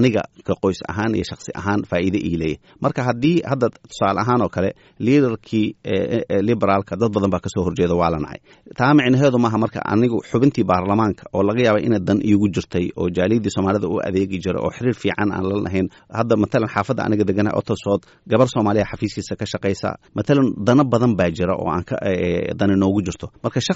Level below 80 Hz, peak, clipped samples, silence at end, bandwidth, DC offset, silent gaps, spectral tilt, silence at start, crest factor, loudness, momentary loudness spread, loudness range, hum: -48 dBFS; -4 dBFS; under 0.1%; 0 s; 8 kHz; under 0.1%; none; -6.5 dB/octave; 0 s; 16 dB; -20 LUFS; 8 LU; 3 LU; none